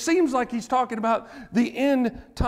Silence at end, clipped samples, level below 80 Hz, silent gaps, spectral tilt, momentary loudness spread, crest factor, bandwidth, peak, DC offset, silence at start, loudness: 0 s; under 0.1%; -40 dBFS; none; -5.5 dB/octave; 6 LU; 12 dB; 15 kHz; -12 dBFS; under 0.1%; 0 s; -24 LUFS